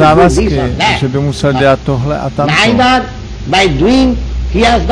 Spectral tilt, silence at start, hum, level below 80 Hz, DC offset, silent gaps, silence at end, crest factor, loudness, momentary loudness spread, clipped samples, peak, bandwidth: -5.5 dB/octave; 0 s; none; -22 dBFS; under 0.1%; none; 0 s; 10 dB; -10 LUFS; 7 LU; under 0.1%; 0 dBFS; 10.5 kHz